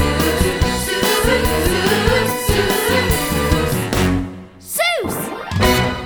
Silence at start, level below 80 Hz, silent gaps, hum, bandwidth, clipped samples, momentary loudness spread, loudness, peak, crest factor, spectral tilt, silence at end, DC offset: 0 s; -26 dBFS; none; none; over 20 kHz; under 0.1%; 8 LU; -17 LUFS; -2 dBFS; 16 dB; -4 dB/octave; 0 s; under 0.1%